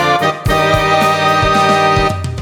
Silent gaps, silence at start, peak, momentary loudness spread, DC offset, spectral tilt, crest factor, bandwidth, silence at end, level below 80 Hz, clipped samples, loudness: none; 0 s; 0 dBFS; 3 LU; under 0.1%; -4.5 dB/octave; 12 dB; 19 kHz; 0 s; -28 dBFS; under 0.1%; -12 LUFS